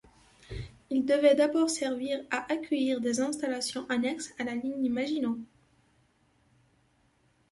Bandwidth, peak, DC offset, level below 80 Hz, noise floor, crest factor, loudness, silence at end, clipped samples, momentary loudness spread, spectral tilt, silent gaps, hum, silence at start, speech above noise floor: 11.5 kHz; -12 dBFS; under 0.1%; -60 dBFS; -68 dBFS; 20 dB; -29 LUFS; 2.05 s; under 0.1%; 11 LU; -4 dB/octave; none; none; 0.5 s; 40 dB